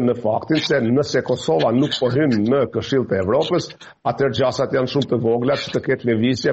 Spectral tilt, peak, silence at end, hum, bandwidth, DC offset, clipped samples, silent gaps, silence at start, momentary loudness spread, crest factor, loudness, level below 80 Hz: -6 dB/octave; -6 dBFS; 0 s; none; 8.2 kHz; under 0.1%; under 0.1%; none; 0 s; 4 LU; 12 dB; -19 LUFS; -54 dBFS